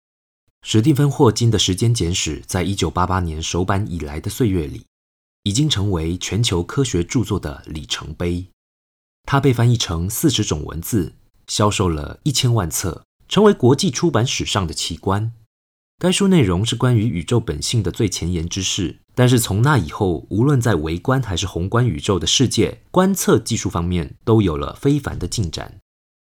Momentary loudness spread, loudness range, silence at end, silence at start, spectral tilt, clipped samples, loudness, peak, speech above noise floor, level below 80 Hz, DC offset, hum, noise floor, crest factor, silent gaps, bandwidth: 10 LU; 3 LU; 0.45 s; 0.65 s; -5 dB/octave; under 0.1%; -19 LUFS; -2 dBFS; over 72 dB; -38 dBFS; under 0.1%; none; under -90 dBFS; 18 dB; 4.87-5.43 s, 8.53-9.24 s, 13.05-13.19 s, 15.46-15.98 s; 17.5 kHz